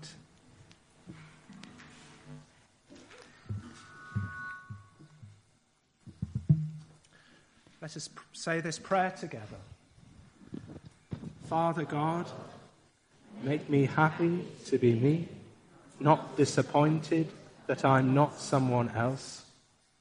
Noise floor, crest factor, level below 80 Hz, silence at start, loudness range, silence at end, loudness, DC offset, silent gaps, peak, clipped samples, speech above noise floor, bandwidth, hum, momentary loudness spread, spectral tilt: -70 dBFS; 24 dB; -64 dBFS; 0 s; 16 LU; 0.6 s; -30 LUFS; under 0.1%; none; -8 dBFS; under 0.1%; 41 dB; 10.5 kHz; none; 25 LU; -6.5 dB/octave